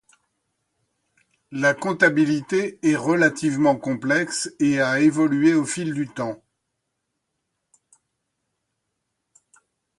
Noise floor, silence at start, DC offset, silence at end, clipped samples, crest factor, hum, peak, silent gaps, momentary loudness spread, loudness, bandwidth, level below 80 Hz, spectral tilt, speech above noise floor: -78 dBFS; 1.5 s; under 0.1%; 3.65 s; under 0.1%; 20 dB; none; -4 dBFS; none; 9 LU; -21 LUFS; 11.5 kHz; -66 dBFS; -5 dB/octave; 58 dB